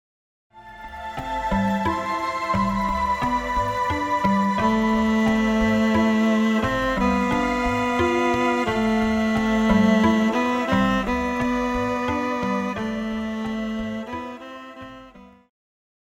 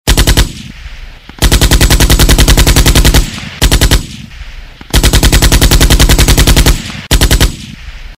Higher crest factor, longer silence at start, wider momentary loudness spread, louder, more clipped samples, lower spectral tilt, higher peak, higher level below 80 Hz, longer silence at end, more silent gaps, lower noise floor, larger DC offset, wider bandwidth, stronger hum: first, 16 dB vs 8 dB; first, 0.55 s vs 0.05 s; second, 11 LU vs 19 LU; second, -22 LUFS vs -8 LUFS; second, under 0.1% vs 2%; first, -6 dB/octave vs -3.5 dB/octave; second, -8 dBFS vs 0 dBFS; second, -40 dBFS vs -10 dBFS; first, 0.8 s vs 0.05 s; neither; first, -46 dBFS vs -27 dBFS; neither; second, 14.5 kHz vs 16.5 kHz; neither